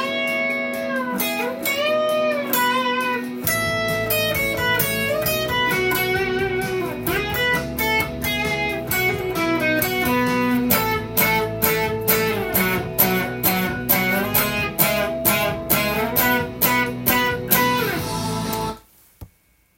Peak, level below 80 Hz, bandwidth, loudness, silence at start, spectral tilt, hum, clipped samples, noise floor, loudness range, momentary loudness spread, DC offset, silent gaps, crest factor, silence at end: 0 dBFS; -44 dBFS; 17 kHz; -20 LUFS; 0 s; -3.5 dB/octave; none; under 0.1%; -59 dBFS; 2 LU; 5 LU; under 0.1%; none; 22 dB; 0.5 s